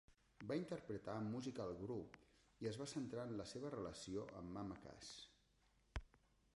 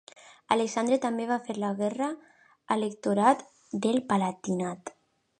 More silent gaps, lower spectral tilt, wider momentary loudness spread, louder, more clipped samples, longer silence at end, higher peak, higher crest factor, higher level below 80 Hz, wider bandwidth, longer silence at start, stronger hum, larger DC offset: neither; about the same, -5.5 dB/octave vs -5.5 dB/octave; about the same, 9 LU vs 10 LU; second, -50 LUFS vs -28 LUFS; neither; about the same, 0.4 s vs 0.5 s; second, -32 dBFS vs -8 dBFS; about the same, 20 dB vs 22 dB; first, -66 dBFS vs -74 dBFS; about the same, 11.5 kHz vs 11 kHz; second, 0.1 s vs 0.25 s; neither; neither